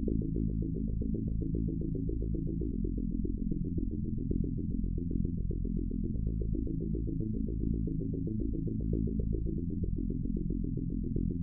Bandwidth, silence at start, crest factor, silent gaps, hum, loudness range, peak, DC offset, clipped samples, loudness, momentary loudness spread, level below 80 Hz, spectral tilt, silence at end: 0.8 kHz; 0 s; 14 dB; none; none; 1 LU; -18 dBFS; under 0.1%; under 0.1%; -35 LUFS; 2 LU; -36 dBFS; -19 dB/octave; 0 s